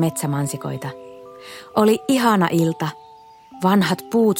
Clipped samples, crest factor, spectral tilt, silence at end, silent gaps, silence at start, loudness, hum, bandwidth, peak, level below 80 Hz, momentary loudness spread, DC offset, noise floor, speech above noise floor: under 0.1%; 16 dB; -5.5 dB/octave; 0 s; none; 0 s; -20 LUFS; none; 17 kHz; -4 dBFS; -62 dBFS; 21 LU; under 0.1%; -45 dBFS; 26 dB